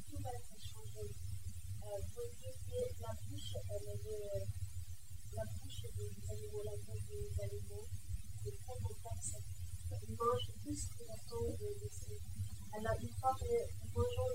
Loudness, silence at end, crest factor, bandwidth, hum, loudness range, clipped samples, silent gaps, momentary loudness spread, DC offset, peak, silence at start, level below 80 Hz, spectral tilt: -45 LUFS; 0 s; 20 dB; 16 kHz; none; 4 LU; under 0.1%; none; 10 LU; 0.5%; -24 dBFS; 0 s; -54 dBFS; -5 dB/octave